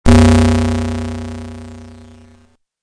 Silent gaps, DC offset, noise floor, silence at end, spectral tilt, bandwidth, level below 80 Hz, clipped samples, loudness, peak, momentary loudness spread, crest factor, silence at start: none; under 0.1%; -51 dBFS; 0.9 s; -6.5 dB/octave; 10.5 kHz; -24 dBFS; 0.2%; -14 LUFS; 0 dBFS; 25 LU; 14 dB; 0.05 s